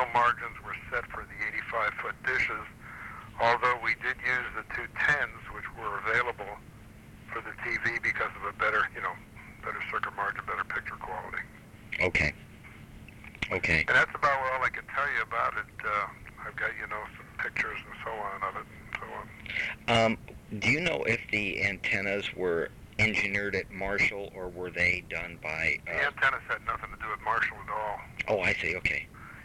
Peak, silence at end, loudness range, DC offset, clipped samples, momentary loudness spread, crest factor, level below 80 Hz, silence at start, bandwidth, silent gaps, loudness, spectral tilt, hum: -12 dBFS; 0 s; 5 LU; under 0.1%; under 0.1%; 15 LU; 20 dB; -52 dBFS; 0 s; 16.5 kHz; none; -30 LUFS; -4.5 dB/octave; none